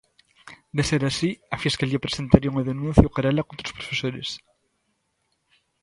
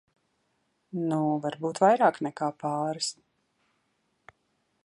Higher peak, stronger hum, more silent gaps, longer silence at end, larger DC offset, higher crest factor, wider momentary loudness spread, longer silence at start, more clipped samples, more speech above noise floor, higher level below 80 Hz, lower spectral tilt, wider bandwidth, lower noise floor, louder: first, 0 dBFS vs -10 dBFS; neither; neither; second, 1.45 s vs 1.75 s; neither; about the same, 24 dB vs 20 dB; about the same, 13 LU vs 11 LU; second, 0.45 s vs 0.95 s; neither; about the same, 50 dB vs 48 dB; first, -38 dBFS vs -80 dBFS; about the same, -6 dB/octave vs -5 dB/octave; about the same, 11.5 kHz vs 11.5 kHz; about the same, -73 dBFS vs -74 dBFS; first, -23 LUFS vs -27 LUFS